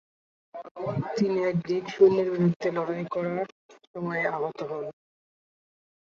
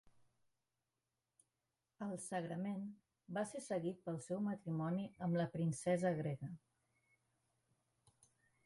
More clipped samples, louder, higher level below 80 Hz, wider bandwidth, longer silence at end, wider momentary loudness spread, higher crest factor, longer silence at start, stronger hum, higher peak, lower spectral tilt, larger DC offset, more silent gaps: neither; first, -27 LUFS vs -42 LUFS; first, -68 dBFS vs -80 dBFS; second, 7.2 kHz vs 11.5 kHz; second, 1.2 s vs 2.1 s; first, 18 LU vs 10 LU; about the same, 20 dB vs 18 dB; second, 0.55 s vs 2 s; neither; first, -8 dBFS vs -26 dBFS; about the same, -8 dB/octave vs -7 dB/octave; neither; first, 0.71-0.75 s, 2.56-2.60 s, 3.52-3.69 s, 3.87-3.94 s vs none